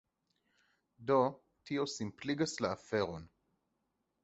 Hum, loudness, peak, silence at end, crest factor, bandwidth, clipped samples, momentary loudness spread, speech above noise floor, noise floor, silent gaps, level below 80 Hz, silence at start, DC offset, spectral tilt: none; -36 LUFS; -16 dBFS; 0.95 s; 22 dB; 8 kHz; under 0.1%; 12 LU; 48 dB; -83 dBFS; none; -68 dBFS; 1 s; under 0.1%; -4.5 dB/octave